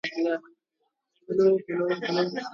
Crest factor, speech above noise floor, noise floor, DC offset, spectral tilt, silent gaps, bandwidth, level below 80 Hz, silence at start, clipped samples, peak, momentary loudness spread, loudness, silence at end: 16 dB; 53 dB; -78 dBFS; under 0.1%; -6 dB/octave; none; 7 kHz; -74 dBFS; 0.05 s; under 0.1%; -10 dBFS; 7 LU; -26 LUFS; 0 s